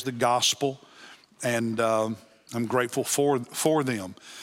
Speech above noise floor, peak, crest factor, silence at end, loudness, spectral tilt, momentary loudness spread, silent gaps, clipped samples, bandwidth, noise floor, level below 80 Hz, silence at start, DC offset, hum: 25 dB; -8 dBFS; 18 dB; 0 s; -26 LUFS; -3.5 dB/octave; 12 LU; none; under 0.1%; 16.5 kHz; -51 dBFS; -76 dBFS; 0 s; under 0.1%; none